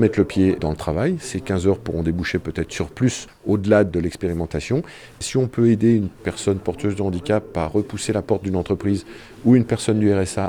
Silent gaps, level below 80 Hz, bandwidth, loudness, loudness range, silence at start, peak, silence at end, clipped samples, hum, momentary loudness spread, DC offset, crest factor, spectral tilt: none; -42 dBFS; 13.5 kHz; -21 LUFS; 2 LU; 0 s; -2 dBFS; 0 s; under 0.1%; none; 9 LU; under 0.1%; 18 dB; -6.5 dB/octave